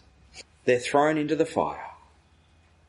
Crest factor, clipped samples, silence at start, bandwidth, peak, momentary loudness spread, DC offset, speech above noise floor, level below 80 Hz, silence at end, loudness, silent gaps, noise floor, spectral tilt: 20 dB; under 0.1%; 0.35 s; 11.5 kHz; -8 dBFS; 22 LU; under 0.1%; 36 dB; -60 dBFS; 0.95 s; -25 LUFS; none; -60 dBFS; -5 dB/octave